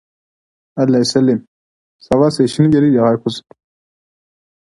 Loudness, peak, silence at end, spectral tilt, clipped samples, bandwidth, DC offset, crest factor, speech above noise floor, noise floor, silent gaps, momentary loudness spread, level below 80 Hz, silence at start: -14 LUFS; 0 dBFS; 1.3 s; -6.5 dB/octave; under 0.1%; 11.5 kHz; under 0.1%; 16 dB; over 77 dB; under -90 dBFS; 1.48-1.99 s; 11 LU; -50 dBFS; 0.75 s